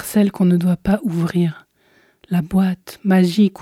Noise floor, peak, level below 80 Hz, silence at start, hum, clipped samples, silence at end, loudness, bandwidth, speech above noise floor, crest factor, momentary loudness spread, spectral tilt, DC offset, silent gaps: -57 dBFS; -4 dBFS; -46 dBFS; 0 s; none; under 0.1%; 0 s; -18 LUFS; 15 kHz; 40 dB; 14 dB; 7 LU; -7.5 dB/octave; under 0.1%; none